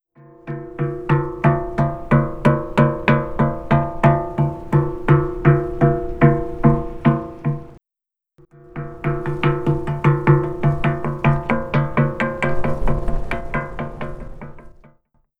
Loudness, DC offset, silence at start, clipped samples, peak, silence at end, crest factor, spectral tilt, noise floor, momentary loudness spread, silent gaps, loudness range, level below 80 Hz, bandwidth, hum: -19 LUFS; under 0.1%; 0.45 s; under 0.1%; 0 dBFS; 0.65 s; 20 dB; -9.5 dB/octave; -87 dBFS; 14 LU; none; 5 LU; -32 dBFS; 4.6 kHz; none